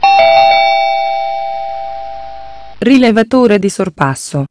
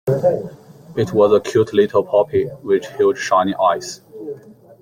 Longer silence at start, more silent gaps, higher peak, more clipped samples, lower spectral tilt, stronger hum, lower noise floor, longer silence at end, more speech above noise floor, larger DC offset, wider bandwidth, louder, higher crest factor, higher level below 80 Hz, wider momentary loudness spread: about the same, 0 s vs 0.05 s; neither; about the same, 0 dBFS vs -2 dBFS; first, 0.5% vs under 0.1%; about the same, -5 dB/octave vs -6 dB/octave; neither; second, -31 dBFS vs -38 dBFS; second, 0 s vs 0.3 s; about the same, 21 dB vs 21 dB; first, 3% vs under 0.1%; second, 11 kHz vs 15.5 kHz; first, -11 LUFS vs -17 LUFS; about the same, 12 dB vs 16 dB; first, -46 dBFS vs -56 dBFS; about the same, 18 LU vs 18 LU